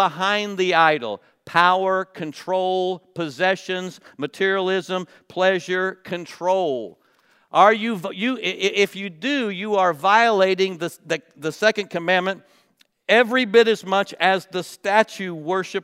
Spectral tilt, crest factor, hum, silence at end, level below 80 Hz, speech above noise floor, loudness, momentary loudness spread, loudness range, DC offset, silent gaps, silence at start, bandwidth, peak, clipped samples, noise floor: -4 dB/octave; 22 dB; none; 0 s; -78 dBFS; 41 dB; -20 LUFS; 14 LU; 4 LU; under 0.1%; none; 0 s; 15.5 kHz; 0 dBFS; under 0.1%; -61 dBFS